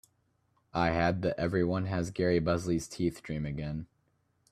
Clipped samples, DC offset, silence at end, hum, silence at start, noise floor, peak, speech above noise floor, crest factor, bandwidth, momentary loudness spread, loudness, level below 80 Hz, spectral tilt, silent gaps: under 0.1%; under 0.1%; 0.65 s; none; 0.75 s; -74 dBFS; -12 dBFS; 43 dB; 20 dB; 13.5 kHz; 9 LU; -31 LUFS; -54 dBFS; -6.5 dB/octave; none